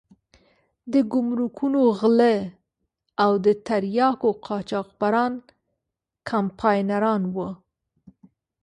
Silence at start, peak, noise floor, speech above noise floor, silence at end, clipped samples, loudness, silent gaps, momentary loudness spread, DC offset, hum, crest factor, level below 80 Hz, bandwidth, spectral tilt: 0.85 s; -4 dBFS; -84 dBFS; 62 dB; 1.1 s; under 0.1%; -22 LUFS; none; 12 LU; under 0.1%; none; 18 dB; -64 dBFS; 9.8 kHz; -7.5 dB/octave